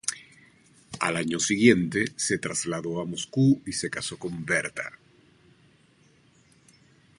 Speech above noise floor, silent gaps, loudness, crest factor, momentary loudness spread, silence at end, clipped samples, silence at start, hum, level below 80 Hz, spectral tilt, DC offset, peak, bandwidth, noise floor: 35 dB; none; -26 LUFS; 24 dB; 14 LU; 2.3 s; under 0.1%; 0.05 s; none; -62 dBFS; -4 dB/octave; under 0.1%; -4 dBFS; 11.5 kHz; -61 dBFS